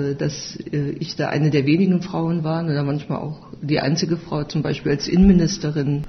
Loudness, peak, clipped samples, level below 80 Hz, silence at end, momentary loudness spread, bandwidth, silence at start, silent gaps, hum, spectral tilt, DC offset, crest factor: -21 LUFS; -4 dBFS; under 0.1%; -38 dBFS; 0 s; 11 LU; 6.4 kHz; 0 s; none; none; -6.5 dB/octave; under 0.1%; 16 dB